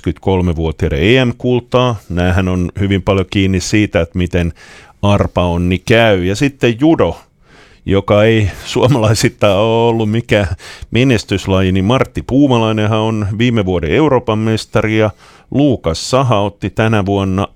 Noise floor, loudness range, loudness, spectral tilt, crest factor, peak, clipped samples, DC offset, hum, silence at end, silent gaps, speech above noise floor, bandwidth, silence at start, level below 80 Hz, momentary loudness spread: -44 dBFS; 2 LU; -13 LUFS; -6 dB/octave; 12 dB; 0 dBFS; under 0.1%; under 0.1%; none; 0.1 s; none; 31 dB; 14.5 kHz; 0.05 s; -32 dBFS; 6 LU